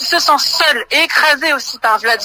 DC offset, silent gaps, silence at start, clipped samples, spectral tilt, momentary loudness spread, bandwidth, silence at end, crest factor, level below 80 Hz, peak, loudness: under 0.1%; none; 0 s; under 0.1%; 0.5 dB/octave; 5 LU; 16 kHz; 0 s; 14 dB; -56 dBFS; 0 dBFS; -12 LUFS